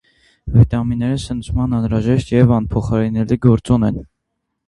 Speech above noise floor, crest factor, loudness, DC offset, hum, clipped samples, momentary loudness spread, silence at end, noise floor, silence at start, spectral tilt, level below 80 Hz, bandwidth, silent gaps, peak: 59 dB; 16 dB; -16 LUFS; under 0.1%; none; under 0.1%; 7 LU; 0.65 s; -74 dBFS; 0.45 s; -8.5 dB/octave; -32 dBFS; 11 kHz; none; 0 dBFS